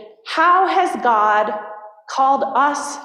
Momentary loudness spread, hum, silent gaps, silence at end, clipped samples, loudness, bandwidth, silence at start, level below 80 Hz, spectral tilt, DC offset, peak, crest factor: 14 LU; none; none; 0 s; under 0.1%; -17 LUFS; 12.5 kHz; 0 s; -72 dBFS; -2 dB/octave; under 0.1%; -4 dBFS; 14 dB